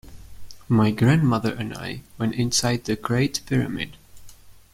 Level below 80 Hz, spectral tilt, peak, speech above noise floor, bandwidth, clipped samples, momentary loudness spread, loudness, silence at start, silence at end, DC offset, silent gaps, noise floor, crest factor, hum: -48 dBFS; -5 dB/octave; -4 dBFS; 22 dB; 16 kHz; under 0.1%; 13 LU; -23 LUFS; 0.05 s; 0.15 s; under 0.1%; none; -44 dBFS; 18 dB; none